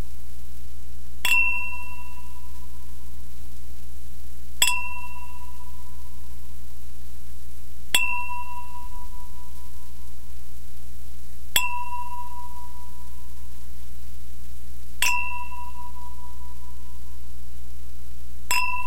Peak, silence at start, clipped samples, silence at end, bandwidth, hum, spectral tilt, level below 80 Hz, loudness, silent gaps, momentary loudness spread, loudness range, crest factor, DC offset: 0 dBFS; 0 s; under 0.1%; 0 s; 16 kHz; none; -1 dB/octave; -42 dBFS; -26 LUFS; none; 21 LU; 9 LU; 32 dB; 10%